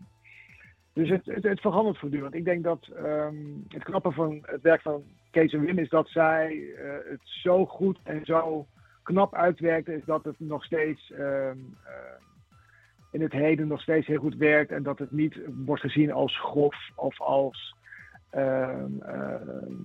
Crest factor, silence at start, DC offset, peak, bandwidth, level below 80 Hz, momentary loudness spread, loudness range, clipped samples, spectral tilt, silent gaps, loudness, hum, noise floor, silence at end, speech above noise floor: 20 dB; 0 s; under 0.1%; -8 dBFS; 6 kHz; -66 dBFS; 14 LU; 4 LU; under 0.1%; -8.5 dB/octave; none; -27 LUFS; none; -59 dBFS; 0 s; 32 dB